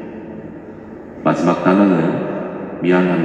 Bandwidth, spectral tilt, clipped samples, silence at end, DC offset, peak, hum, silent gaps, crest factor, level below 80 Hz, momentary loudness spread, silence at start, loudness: 8.4 kHz; -8 dB/octave; under 0.1%; 0 s; under 0.1%; 0 dBFS; none; none; 16 dB; -54 dBFS; 21 LU; 0 s; -16 LUFS